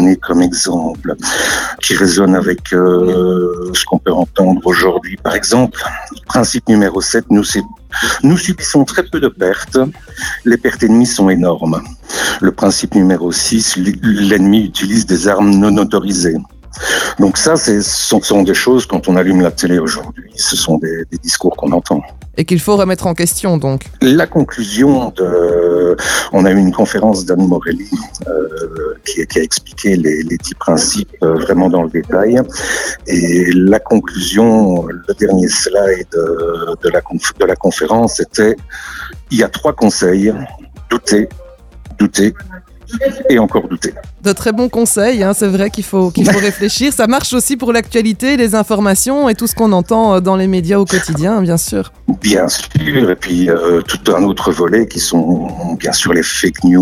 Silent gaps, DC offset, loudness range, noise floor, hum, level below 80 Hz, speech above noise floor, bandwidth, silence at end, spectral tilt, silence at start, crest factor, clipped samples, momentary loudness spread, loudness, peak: none; under 0.1%; 3 LU; -34 dBFS; none; -36 dBFS; 22 dB; 16 kHz; 0 s; -4.5 dB/octave; 0 s; 12 dB; under 0.1%; 8 LU; -12 LUFS; 0 dBFS